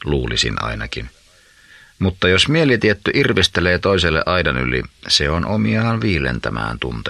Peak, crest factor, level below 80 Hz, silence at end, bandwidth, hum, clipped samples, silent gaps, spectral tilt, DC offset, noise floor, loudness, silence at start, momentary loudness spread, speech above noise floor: 0 dBFS; 18 dB; -34 dBFS; 0 s; 12 kHz; none; under 0.1%; none; -4.5 dB/octave; under 0.1%; -50 dBFS; -17 LUFS; 0 s; 9 LU; 32 dB